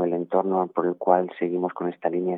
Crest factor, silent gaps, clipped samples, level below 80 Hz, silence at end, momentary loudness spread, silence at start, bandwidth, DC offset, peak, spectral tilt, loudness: 20 dB; none; under 0.1%; -82 dBFS; 0 s; 5 LU; 0 s; 3.9 kHz; under 0.1%; -4 dBFS; -10.5 dB/octave; -25 LUFS